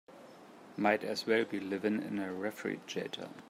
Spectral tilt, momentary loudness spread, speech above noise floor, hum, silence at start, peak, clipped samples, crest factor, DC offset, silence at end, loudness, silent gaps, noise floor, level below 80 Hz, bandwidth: -5 dB/octave; 23 LU; 20 dB; none; 0.1 s; -14 dBFS; under 0.1%; 22 dB; under 0.1%; 0 s; -35 LUFS; none; -54 dBFS; -82 dBFS; 16 kHz